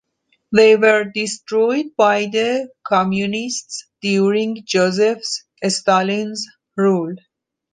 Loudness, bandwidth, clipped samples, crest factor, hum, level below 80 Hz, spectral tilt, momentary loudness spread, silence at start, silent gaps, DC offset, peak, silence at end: -17 LUFS; 9.8 kHz; under 0.1%; 16 dB; none; -64 dBFS; -4.5 dB/octave; 12 LU; 0.5 s; none; under 0.1%; -2 dBFS; 0.55 s